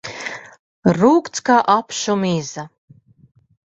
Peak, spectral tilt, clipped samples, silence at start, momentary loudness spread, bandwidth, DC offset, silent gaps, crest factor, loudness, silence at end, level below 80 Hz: -2 dBFS; -5 dB/octave; under 0.1%; 0.05 s; 17 LU; 8.2 kHz; under 0.1%; 0.59-0.83 s; 18 dB; -17 LUFS; 1.1 s; -58 dBFS